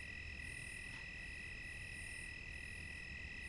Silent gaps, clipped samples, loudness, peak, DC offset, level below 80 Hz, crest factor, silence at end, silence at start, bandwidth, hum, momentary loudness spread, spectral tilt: none; under 0.1%; -48 LUFS; -38 dBFS; under 0.1%; -58 dBFS; 12 dB; 0 s; 0 s; 11.5 kHz; none; 1 LU; -3 dB/octave